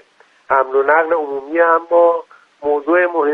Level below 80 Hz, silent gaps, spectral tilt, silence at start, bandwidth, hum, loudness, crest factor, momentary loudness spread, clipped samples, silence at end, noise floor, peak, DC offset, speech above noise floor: -64 dBFS; none; -6.5 dB/octave; 0.5 s; 3.9 kHz; none; -15 LUFS; 16 dB; 7 LU; under 0.1%; 0 s; -49 dBFS; 0 dBFS; under 0.1%; 35 dB